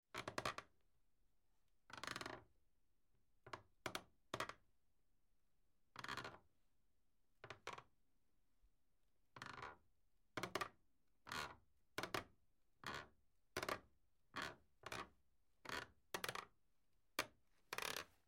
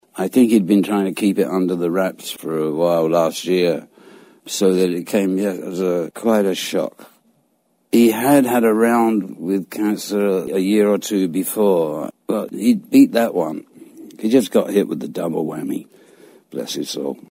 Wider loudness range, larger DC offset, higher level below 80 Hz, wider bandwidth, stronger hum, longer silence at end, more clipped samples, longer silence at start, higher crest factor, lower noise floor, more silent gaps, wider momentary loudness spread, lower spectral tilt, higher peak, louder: first, 7 LU vs 4 LU; neither; second, -78 dBFS vs -66 dBFS; about the same, 16 kHz vs 16 kHz; neither; about the same, 0.2 s vs 0.15 s; neither; about the same, 0.15 s vs 0.15 s; first, 28 dB vs 16 dB; first, -86 dBFS vs -64 dBFS; neither; about the same, 13 LU vs 11 LU; second, -2.5 dB/octave vs -5.5 dB/octave; second, -26 dBFS vs -2 dBFS; second, -51 LUFS vs -18 LUFS